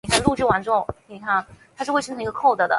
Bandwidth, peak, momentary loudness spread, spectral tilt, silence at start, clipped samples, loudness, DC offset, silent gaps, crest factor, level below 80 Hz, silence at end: 12 kHz; -2 dBFS; 11 LU; -4 dB/octave; 0.05 s; under 0.1%; -22 LUFS; under 0.1%; none; 20 dB; -46 dBFS; 0 s